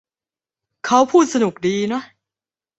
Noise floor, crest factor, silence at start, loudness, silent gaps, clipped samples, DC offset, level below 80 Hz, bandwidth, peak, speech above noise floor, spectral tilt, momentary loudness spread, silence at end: under -90 dBFS; 18 dB; 0.85 s; -17 LUFS; none; under 0.1%; under 0.1%; -64 dBFS; 8.2 kHz; -2 dBFS; over 74 dB; -4.5 dB/octave; 12 LU; 0.75 s